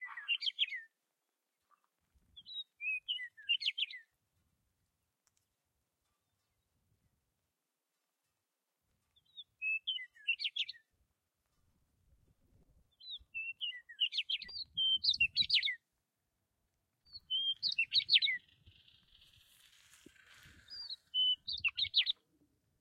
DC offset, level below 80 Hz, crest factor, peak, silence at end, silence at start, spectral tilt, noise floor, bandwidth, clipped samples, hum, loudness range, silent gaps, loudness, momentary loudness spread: under 0.1%; -76 dBFS; 26 dB; -16 dBFS; 0.7 s; 0 s; 1 dB/octave; -88 dBFS; 15.5 kHz; under 0.1%; none; 9 LU; none; -34 LUFS; 17 LU